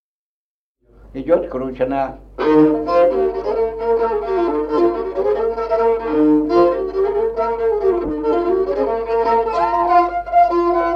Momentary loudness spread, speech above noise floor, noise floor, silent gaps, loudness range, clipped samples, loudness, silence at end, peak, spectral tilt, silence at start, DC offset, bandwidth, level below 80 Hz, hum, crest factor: 6 LU; over 74 dB; under -90 dBFS; none; 1 LU; under 0.1%; -17 LUFS; 0 s; -2 dBFS; -8 dB/octave; 1.05 s; under 0.1%; 6.4 kHz; -42 dBFS; none; 14 dB